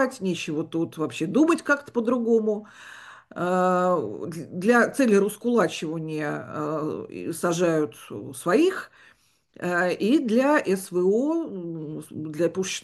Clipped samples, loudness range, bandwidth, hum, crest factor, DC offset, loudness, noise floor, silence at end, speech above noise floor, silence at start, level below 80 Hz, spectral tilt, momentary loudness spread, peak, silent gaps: under 0.1%; 3 LU; 12.5 kHz; none; 18 dB; under 0.1%; -24 LUFS; -60 dBFS; 0.05 s; 36 dB; 0 s; -70 dBFS; -5.5 dB/octave; 14 LU; -8 dBFS; none